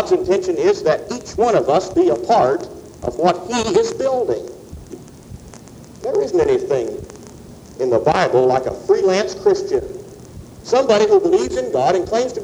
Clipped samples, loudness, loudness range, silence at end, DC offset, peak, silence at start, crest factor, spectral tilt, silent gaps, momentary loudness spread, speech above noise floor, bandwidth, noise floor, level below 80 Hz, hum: under 0.1%; -17 LUFS; 5 LU; 0 s; under 0.1%; -2 dBFS; 0 s; 16 dB; -5 dB/octave; none; 22 LU; 22 dB; 11.5 kHz; -39 dBFS; -46 dBFS; none